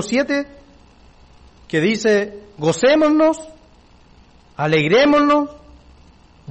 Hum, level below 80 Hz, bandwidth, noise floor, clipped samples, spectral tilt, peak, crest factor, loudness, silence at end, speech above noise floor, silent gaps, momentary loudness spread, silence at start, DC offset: none; -50 dBFS; 8.8 kHz; -49 dBFS; under 0.1%; -5 dB/octave; -6 dBFS; 14 dB; -17 LUFS; 0.95 s; 32 dB; none; 15 LU; 0 s; under 0.1%